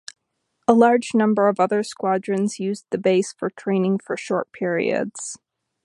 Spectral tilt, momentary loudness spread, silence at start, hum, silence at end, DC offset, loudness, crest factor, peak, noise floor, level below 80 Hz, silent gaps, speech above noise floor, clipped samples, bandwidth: -5.5 dB/octave; 11 LU; 0.7 s; none; 0.5 s; under 0.1%; -21 LUFS; 20 dB; -2 dBFS; -74 dBFS; -70 dBFS; none; 54 dB; under 0.1%; 11.5 kHz